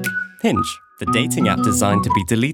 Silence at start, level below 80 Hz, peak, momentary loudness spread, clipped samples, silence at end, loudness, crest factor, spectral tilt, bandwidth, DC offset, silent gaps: 0 s; -48 dBFS; -2 dBFS; 7 LU; under 0.1%; 0 s; -19 LUFS; 18 dB; -4.5 dB/octave; 18 kHz; under 0.1%; none